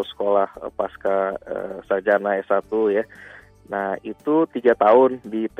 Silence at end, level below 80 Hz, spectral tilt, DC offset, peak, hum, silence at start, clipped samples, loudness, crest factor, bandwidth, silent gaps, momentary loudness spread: 0.15 s; -58 dBFS; -7.5 dB/octave; under 0.1%; -4 dBFS; none; 0 s; under 0.1%; -21 LUFS; 18 dB; 8.6 kHz; none; 13 LU